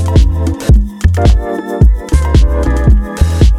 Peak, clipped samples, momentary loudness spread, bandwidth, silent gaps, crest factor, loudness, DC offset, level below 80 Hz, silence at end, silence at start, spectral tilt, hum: 0 dBFS; under 0.1%; 4 LU; 12 kHz; none; 8 dB; -12 LUFS; under 0.1%; -10 dBFS; 0 s; 0 s; -7 dB/octave; none